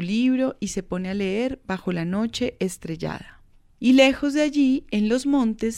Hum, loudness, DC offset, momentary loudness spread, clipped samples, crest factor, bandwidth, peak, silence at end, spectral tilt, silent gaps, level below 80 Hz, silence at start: none; -23 LUFS; under 0.1%; 12 LU; under 0.1%; 20 dB; 13 kHz; -4 dBFS; 0 s; -5 dB/octave; none; -48 dBFS; 0 s